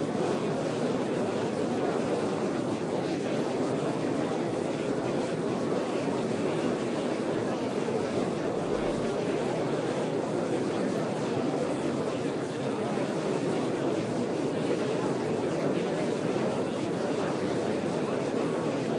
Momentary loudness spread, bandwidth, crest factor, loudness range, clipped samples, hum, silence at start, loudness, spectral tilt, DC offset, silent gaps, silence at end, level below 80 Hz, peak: 1 LU; 11.5 kHz; 14 dB; 1 LU; under 0.1%; none; 0 s; -30 LUFS; -6 dB/octave; under 0.1%; none; 0 s; -62 dBFS; -16 dBFS